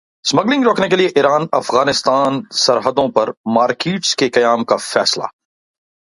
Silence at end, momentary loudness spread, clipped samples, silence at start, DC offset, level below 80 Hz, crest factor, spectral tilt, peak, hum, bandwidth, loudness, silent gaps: 0.75 s; 4 LU; under 0.1%; 0.25 s; under 0.1%; -58 dBFS; 16 dB; -3.5 dB/octave; 0 dBFS; none; 11.5 kHz; -15 LUFS; 3.37-3.44 s